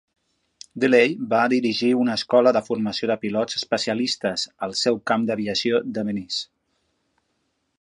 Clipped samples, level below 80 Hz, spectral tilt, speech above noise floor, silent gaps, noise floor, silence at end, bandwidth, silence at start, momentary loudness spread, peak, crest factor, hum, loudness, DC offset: under 0.1%; -66 dBFS; -4.5 dB/octave; 51 dB; none; -72 dBFS; 1.35 s; 11 kHz; 0.75 s; 9 LU; -2 dBFS; 20 dB; none; -22 LUFS; under 0.1%